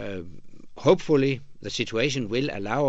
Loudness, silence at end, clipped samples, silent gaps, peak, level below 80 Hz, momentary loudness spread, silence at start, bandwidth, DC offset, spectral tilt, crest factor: -25 LUFS; 0 s; under 0.1%; none; -6 dBFS; -52 dBFS; 14 LU; 0 s; 8.2 kHz; under 0.1%; -5.5 dB/octave; 20 dB